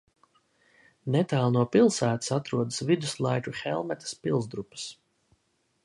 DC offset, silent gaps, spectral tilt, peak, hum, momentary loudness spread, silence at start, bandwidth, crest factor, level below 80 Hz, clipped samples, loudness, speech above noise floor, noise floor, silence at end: under 0.1%; none; -5.5 dB/octave; -10 dBFS; none; 15 LU; 1.05 s; 11.5 kHz; 18 dB; -66 dBFS; under 0.1%; -27 LUFS; 46 dB; -73 dBFS; 0.9 s